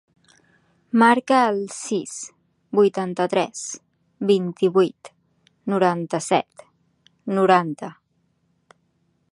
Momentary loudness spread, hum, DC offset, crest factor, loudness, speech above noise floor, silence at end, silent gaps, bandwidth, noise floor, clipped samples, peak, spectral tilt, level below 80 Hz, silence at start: 17 LU; none; under 0.1%; 20 dB; -21 LUFS; 48 dB; 1.4 s; none; 11.5 kHz; -68 dBFS; under 0.1%; -2 dBFS; -5 dB/octave; -74 dBFS; 0.95 s